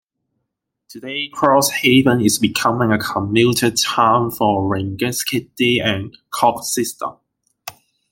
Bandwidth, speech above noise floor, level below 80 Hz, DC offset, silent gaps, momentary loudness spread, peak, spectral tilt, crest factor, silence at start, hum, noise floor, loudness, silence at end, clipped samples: 17 kHz; 60 dB; -54 dBFS; under 0.1%; none; 15 LU; 0 dBFS; -4 dB/octave; 18 dB; 0.9 s; none; -77 dBFS; -17 LUFS; 0.4 s; under 0.1%